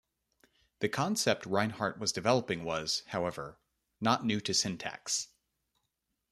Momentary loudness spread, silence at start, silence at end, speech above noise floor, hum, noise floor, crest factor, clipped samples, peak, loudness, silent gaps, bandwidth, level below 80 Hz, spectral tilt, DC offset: 8 LU; 0.8 s; 1.05 s; 51 dB; none; -83 dBFS; 22 dB; under 0.1%; -12 dBFS; -32 LUFS; none; 13.5 kHz; -68 dBFS; -3.5 dB/octave; under 0.1%